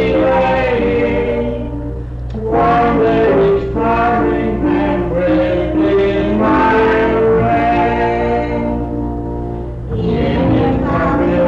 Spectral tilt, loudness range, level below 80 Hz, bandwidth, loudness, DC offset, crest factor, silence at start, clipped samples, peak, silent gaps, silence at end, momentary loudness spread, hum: -8.5 dB/octave; 3 LU; -26 dBFS; 7.4 kHz; -14 LUFS; under 0.1%; 8 dB; 0 s; under 0.1%; -6 dBFS; none; 0 s; 10 LU; none